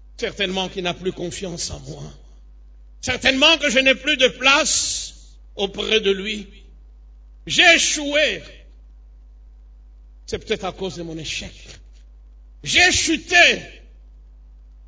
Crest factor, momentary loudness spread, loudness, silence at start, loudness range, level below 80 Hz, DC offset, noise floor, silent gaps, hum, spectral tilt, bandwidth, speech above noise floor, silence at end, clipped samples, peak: 20 dB; 18 LU; -17 LUFS; 0.2 s; 14 LU; -42 dBFS; under 0.1%; -44 dBFS; none; none; -1.5 dB/octave; 8 kHz; 24 dB; 0.05 s; under 0.1%; 0 dBFS